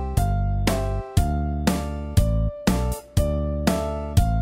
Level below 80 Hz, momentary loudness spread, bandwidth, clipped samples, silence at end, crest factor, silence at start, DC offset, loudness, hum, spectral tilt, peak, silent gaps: -26 dBFS; 3 LU; 16 kHz; under 0.1%; 0 s; 18 dB; 0 s; under 0.1%; -24 LUFS; none; -6.5 dB/octave; -4 dBFS; none